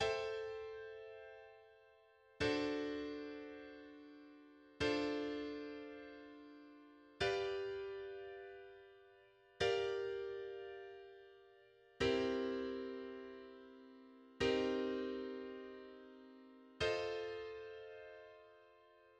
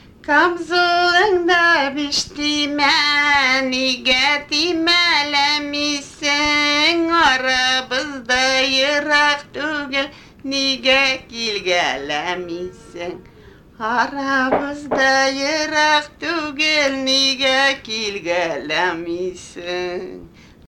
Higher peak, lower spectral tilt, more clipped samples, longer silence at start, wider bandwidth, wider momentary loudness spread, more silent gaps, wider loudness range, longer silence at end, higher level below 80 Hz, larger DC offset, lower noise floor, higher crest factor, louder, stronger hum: second, -24 dBFS vs -2 dBFS; first, -5 dB/octave vs -1.5 dB/octave; neither; second, 0 s vs 0.25 s; second, 9.8 kHz vs 16.5 kHz; first, 23 LU vs 11 LU; neither; about the same, 4 LU vs 5 LU; second, 0.05 s vs 0.4 s; second, -68 dBFS vs -50 dBFS; neither; first, -68 dBFS vs -45 dBFS; about the same, 20 dB vs 16 dB; second, -42 LUFS vs -17 LUFS; neither